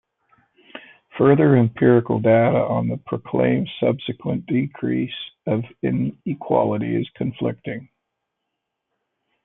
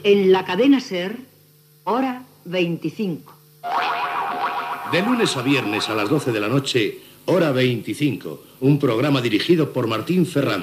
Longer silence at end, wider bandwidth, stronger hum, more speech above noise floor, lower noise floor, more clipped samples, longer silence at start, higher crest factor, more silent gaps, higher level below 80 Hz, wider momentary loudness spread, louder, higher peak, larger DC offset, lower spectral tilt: first, 1.6 s vs 0 s; second, 3.9 kHz vs 15 kHz; neither; first, 60 dB vs 33 dB; first, -79 dBFS vs -53 dBFS; neither; first, 0.75 s vs 0 s; about the same, 18 dB vs 16 dB; neither; first, -58 dBFS vs -70 dBFS; first, 14 LU vs 10 LU; about the same, -20 LUFS vs -20 LUFS; first, -2 dBFS vs -6 dBFS; neither; first, -12.5 dB/octave vs -6 dB/octave